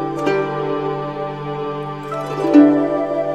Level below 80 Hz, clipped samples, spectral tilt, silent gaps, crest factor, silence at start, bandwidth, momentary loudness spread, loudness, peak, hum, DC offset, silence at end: -56 dBFS; under 0.1%; -7.5 dB/octave; none; 18 dB; 0 s; 8 kHz; 14 LU; -18 LUFS; 0 dBFS; none; 0.3%; 0 s